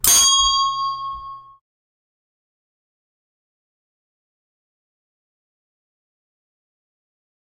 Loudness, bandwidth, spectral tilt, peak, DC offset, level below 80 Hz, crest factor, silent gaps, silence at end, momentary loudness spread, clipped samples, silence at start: -15 LUFS; 16 kHz; 2 dB/octave; 0 dBFS; under 0.1%; -50 dBFS; 26 dB; none; 6.05 s; 22 LU; under 0.1%; 0.05 s